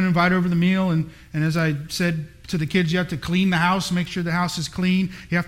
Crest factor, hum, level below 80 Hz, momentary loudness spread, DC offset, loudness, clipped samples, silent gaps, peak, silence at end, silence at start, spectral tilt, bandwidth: 14 dB; none; -48 dBFS; 6 LU; under 0.1%; -22 LUFS; under 0.1%; none; -6 dBFS; 0 s; 0 s; -6 dB/octave; 15.5 kHz